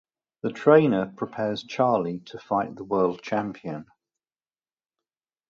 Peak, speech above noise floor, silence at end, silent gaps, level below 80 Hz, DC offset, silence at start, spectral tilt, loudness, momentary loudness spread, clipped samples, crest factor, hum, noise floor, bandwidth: -4 dBFS; over 66 dB; 1.65 s; none; -66 dBFS; under 0.1%; 0.45 s; -7.5 dB/octave; -25 LUFS; 16 LU; under 0.1%; 22 dB; none; under -90 dBFS; 7.2 kHz